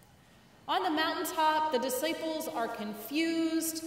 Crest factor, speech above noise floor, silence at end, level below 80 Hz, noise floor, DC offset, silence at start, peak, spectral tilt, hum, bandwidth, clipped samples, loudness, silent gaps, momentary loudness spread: 16 dB; 28 dB; 0 s; -72 dBFS; -59 dBFS; under 0.1%; 0.65 s; -16 dBFS; -2.5 dB/octave; none; 16 kHz; under 0.1%; -31 LUFS; none; 7 LU